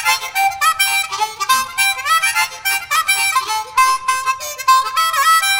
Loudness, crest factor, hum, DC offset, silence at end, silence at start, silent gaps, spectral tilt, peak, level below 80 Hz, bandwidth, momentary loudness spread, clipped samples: -15 LUFS; 16 dB; none; under 0.1%; 0 s; 0 s; none; 2.5 dB/octave; -2 dBFS; -56 dBFS; 16.5 kHz; 5 LU; under 0.1%